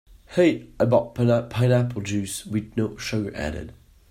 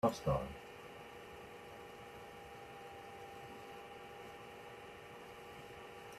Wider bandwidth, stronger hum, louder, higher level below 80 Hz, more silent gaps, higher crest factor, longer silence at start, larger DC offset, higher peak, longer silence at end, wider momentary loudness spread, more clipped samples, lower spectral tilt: about the same, 14.5 kHz vs 14.5 kHz; neither; first, -24 LUFS vs -48 LUFS; first, -48 dBFS vs -62 dBFS; neither; second, 18 dB vs 24 dB; about the same, 0.1 s vs 0.05 s; neither; first, -4 dBFS vs -20 dBFS; first, 0.4 s vs 0 s; second, 9 LU vs 13 LU; neither; about the same, -6.5 dB/octave vs -6 dB/octave